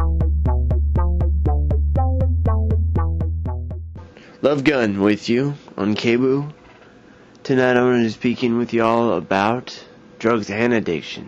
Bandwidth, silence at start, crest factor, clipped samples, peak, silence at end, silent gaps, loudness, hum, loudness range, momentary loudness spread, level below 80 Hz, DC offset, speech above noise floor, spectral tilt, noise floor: 7.4 kHz; 0 s; 14 dB; under 0.1%; -4 dBFS; 0 s; none; -19 LUFS; none; 2 LU; 9 LU; -24 dBFS; under 0.1%; 28 dB; -7.5 dB/octave; -46 dBFS